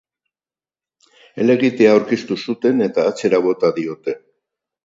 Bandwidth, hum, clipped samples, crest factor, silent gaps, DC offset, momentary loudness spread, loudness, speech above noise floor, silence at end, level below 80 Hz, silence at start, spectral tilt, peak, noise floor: 7.8 kHz; none; under 0.1%; 18 dB; none; under 0.1%; 13 LU; -17 LUFS; over 74 dB; 0.65 s; -68 dBFS; 1.35 s; -6 dB/octave; 0 dBFS; under -90 dBFS